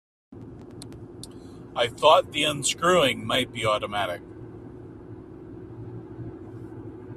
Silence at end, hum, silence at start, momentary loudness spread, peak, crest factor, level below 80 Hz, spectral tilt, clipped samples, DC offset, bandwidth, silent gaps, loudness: 0 s; none; 0.3 s; 23 LU; -4 dBFS; 24 dB; -56 dBFS; -3 dB/octave; under 0.1%; under 0.1%; 15 kHz; none; -23 LUFS